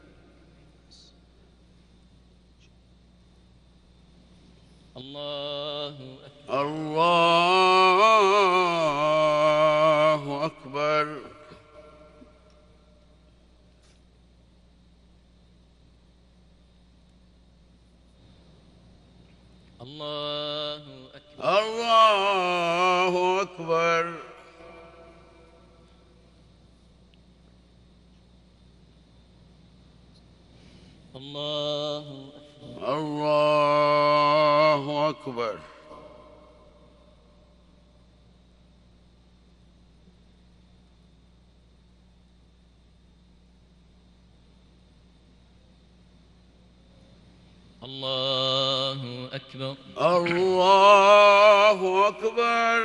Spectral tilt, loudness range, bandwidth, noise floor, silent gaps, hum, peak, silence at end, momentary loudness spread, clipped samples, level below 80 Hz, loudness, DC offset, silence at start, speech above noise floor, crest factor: -4.5 dB/octave; 18 LU; 11.5 kHz; -57 dBFS; none; none; -4 dBFS; 0 s; 21 LU; under 0.1%; -60 dBFS; -22 LUFS; under 0.1%; 4.95 s; 32 dB; 22 dB